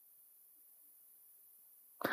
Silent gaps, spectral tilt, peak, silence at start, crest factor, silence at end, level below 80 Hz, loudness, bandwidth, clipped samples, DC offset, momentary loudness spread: none; -3.5 dB/octave; -20 dBFS; 0 s; 30 dB; 0 s; under -90 dBFS; -55 LUFS; 15.5 kHz; under 0.1%; under 0.1%; 4 LU